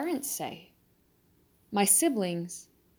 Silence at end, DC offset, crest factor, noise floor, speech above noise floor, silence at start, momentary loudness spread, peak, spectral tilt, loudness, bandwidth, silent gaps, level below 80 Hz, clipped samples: 0.35 s; under 0.1%; 22 dB; -67 dBFS; 38 dB; 0 s; 19 LU; -10 dBFS; -3 dB/octave; -27 LUFS; over 20 kHz; none; -74 dBFS; under 0.1%